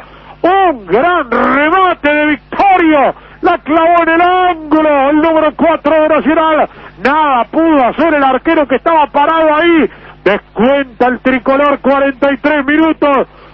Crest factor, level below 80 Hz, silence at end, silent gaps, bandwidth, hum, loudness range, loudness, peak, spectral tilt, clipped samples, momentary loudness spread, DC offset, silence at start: 10 dB; -40 dBFS; 0.3 s; none; 5.8 kHz; none; 1 LU; -10 LUFS; 0 dBFS; -7 dB/octave; 0.1%; 5 LU; under 0.1%; 0 s